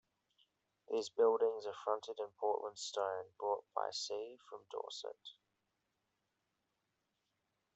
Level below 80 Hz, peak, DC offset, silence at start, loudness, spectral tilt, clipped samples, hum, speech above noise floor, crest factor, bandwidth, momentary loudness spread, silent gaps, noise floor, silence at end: under -90 dBFS; -20 dBFS; under 0.1%; 0.9 s; -40 LUFS; -2 dB/octave; under 0.1%; none; 46 dB; 22 dB; 8.2 kHz; 16 LU; none; -86 dBFS; 2.45 s